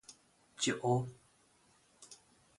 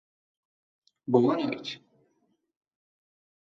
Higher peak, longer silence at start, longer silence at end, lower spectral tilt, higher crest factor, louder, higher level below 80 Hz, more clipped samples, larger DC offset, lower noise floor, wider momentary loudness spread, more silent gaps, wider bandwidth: second, -18 dBFS vs -10 dBFS; second, 0.1 s vs 1.1 s; second, 0.45 s vs 1.75 s; second, -4.5 dB/octave vs -7 dB/octave; about the same, 22 dB vs 22 dB; second, -35 LUFS vs -27 LUFS; first, -72 dBFS vs -78 dBFS; neither; neither; second, -69 dBFS vs -74 dBFS; first, 25 LU vs 20 LU; neither; first, 11.5 kHz vs 7.4 kHz